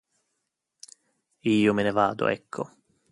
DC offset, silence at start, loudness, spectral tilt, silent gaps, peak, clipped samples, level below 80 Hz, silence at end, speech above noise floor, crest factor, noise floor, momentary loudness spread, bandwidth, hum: under 0.1%; 1.45 s; -25 LUFS; -6 dB/octave; none; -8 dBFS; under 0.1%; -64 dBFS; 0.45 s; 56 dB; 20 dB; -80 dBFS; 14 LU; 11.5 kHz; none